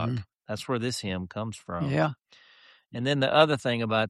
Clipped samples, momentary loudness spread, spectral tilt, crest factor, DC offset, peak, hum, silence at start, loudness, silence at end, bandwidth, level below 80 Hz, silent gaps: under 0.1%; 15 LU; -5.5 dB/octave; 22 dB; under 0.1%; -6 dBFS; none; 0 s; -28 LUFS; 0 s; 13 kHz; -62 dBFS; none